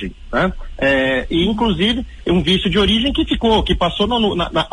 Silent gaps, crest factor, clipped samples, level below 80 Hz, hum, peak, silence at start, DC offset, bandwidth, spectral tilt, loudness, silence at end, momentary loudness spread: none; 12 dB; under 0.1%; -28 dBFS; none; -4 dBFS; 0 s; under 0.1%; 10.5 kHz; -6 dB/octave; -17 LUFS; 0.05 s; 5 LU